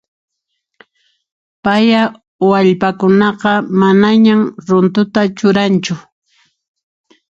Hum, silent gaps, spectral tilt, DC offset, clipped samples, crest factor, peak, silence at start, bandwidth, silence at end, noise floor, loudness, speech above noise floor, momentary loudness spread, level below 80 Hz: none; 2.28-2.39 s; -6.5 dB/octave; under 0.1%; under 0.1%; 14 dB; 0 dBFS; 1.65 s; 7.8 kHz; 1.3 s; -72 dBFS; -12 LUFS; 61 dB; 7 LU; -54 dBFS